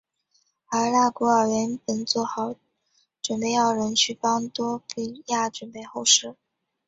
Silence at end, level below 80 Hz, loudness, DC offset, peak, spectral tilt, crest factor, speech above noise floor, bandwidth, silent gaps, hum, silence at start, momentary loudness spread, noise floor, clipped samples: 0.55 s; -68 dBFS; -24 LUFS; under 0.1%; -4 dBFS; -2 dB/octave; 22 dB; 45 dB; 8.2 kHz; none; none; 0.7 s; 13 LU; -69 dBFS; under 0.1%